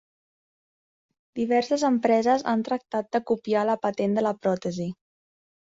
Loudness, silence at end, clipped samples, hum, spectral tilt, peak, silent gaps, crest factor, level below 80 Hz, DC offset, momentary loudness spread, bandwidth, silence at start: -25 LUFS; 0.85 s; under 0.1%; none; -6 dB/octave; -8 dBFS; none; 18 dB; -68 dBFS; under 0.1%; 10 LU; 8 kHz; 1.35 s